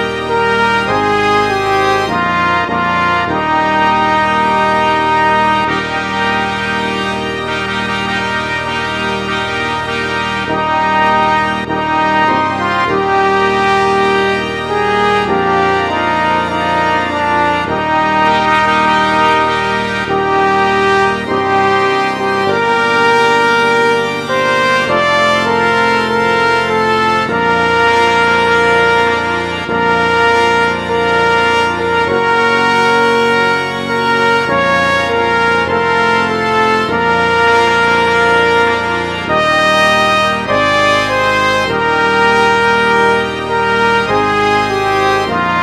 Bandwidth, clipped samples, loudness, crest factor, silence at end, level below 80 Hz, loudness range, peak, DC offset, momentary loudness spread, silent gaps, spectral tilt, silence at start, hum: 14 kHz; under 0.1%; -12 LUFS; 12 dB; 0 s; -40 dBFS; 3 LU; 0 dBFS; under 0.1%; 5 LU; none; -4.5 dB/octave; 0 s; none